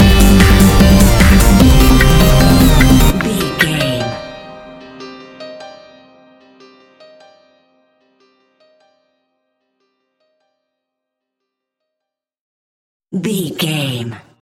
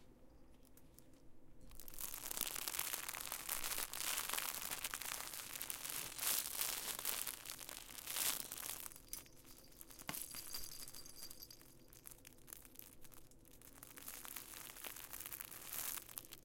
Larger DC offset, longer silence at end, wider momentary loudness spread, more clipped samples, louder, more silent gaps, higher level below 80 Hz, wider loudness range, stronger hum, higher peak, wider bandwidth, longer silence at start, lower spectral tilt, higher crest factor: neither; first, 0.25 s vs 0 s; first, 24 LU vs 20 LU; neither; first, -11 LUFS vs -44 LUFS; first, 12.40-13.00 s vs none; first, -18 dBFS vs -66 dBFS; first, 24 LU vs 12 LU; neither; first, 0 dBFS vs -14 dBFS; about the same, 17 kHz vs 17 kHz; about the same, 0 s vs 0 s; first, -5 dB/octave vs 0 dB/octave; second, 14 dB vs 32 dB